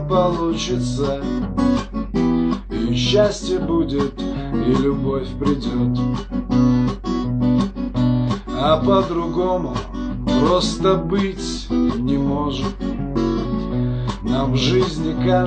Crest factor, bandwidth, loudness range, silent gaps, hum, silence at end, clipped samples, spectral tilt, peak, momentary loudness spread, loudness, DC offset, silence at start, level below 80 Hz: 16 dB; 9.2 kHz; 2 LU; none; none; 0 s; under 0.1%; -6.5 dB/octave; -4 dBFS; 6 LU; -20 LUFS; under 0.1%; 0 s; -32 dBFS